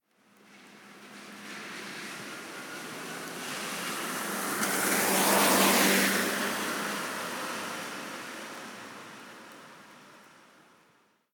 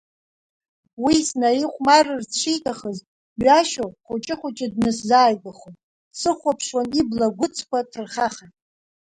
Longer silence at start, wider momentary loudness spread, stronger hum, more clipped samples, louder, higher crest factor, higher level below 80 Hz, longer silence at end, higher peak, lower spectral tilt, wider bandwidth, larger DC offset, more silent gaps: second, 0.5 s vs 1 s; first, 24 LU vs 14 LU; neither; neither; second, -29 LUFS vs -21 LUFS; about the same, 22 dB vs 20 dB; second, -82 dBFS vs -56 dBFS; first, 1.1 s vs 0.7 s; second, -10 dBFS vs -2 dBFS; second, -2 dB/octave vs -3.5 dB/octave; first, 19.5 kHz vs 11 kHz; neither; second, none vs 3.07-3.36 s, 5.83-6.11 s